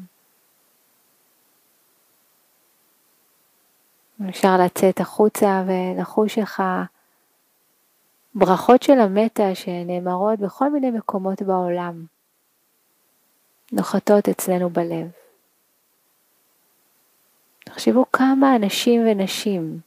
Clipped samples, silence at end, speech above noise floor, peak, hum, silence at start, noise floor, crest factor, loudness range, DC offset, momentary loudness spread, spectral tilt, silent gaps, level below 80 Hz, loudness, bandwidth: under 0.1%; 0.05 s; 47 dB; 0 dBFS; none; 0 s; -66 dBFS; 22 dB; 8 LU; under 0.1%; 12 LU; -5.5 dB/octave; none; -70 dBFS; -19 LUFS; 15.5 kHz